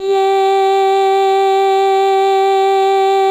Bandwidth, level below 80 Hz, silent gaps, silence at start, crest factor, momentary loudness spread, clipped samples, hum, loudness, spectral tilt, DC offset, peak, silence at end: 15.5 kHz; -66 dBFS; none; 0 s; 6 dB; 0 LU; under 0.1%; none; -12 LUFS; -2 dB/octave; under 0.1%; -4 dBFS; 0 s